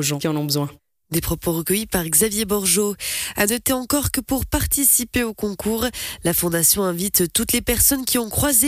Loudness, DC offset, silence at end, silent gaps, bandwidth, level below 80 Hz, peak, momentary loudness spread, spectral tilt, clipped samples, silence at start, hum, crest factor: -19 LUFS; under 0.1%; 0 s; none; 16 kHz; -38 dBFS; -4 dBFS; 8 LU; -3 dB/octave; under 0.1%; 0 s; none; 16 dB